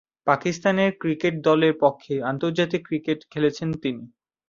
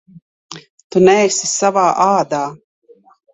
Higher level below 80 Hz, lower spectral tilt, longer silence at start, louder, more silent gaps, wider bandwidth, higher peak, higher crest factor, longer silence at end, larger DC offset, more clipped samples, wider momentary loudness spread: about the same, -62 dBFS vs -58 dBFS; first, -6.5 dB/octave vs -4 dB/octave; second, 0.25 s vs 0.5 s; second, -23 LUFS vs -14 LUFS; second, none vs 0.70-0.78 s, 0.84-0.90 s; second, 7.6 kHz vs 8.4 kHz; second, -4 dBFS vs 0 dBFS; about the same, 20 dB vs 16 dB; second, 0.45 s vs 0.8 s; neither; neither; second, 9 LU vs 24 LU